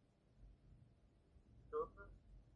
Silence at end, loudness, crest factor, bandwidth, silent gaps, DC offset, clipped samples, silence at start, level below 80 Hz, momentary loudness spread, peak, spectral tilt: 0 s; -50 LUFS; 20 dB; 5.6 kHz; none; under 0.1%; under 0.1%; 0 s; -68 dBFS; 22 LU; -34 dBFS; -8 dB/octave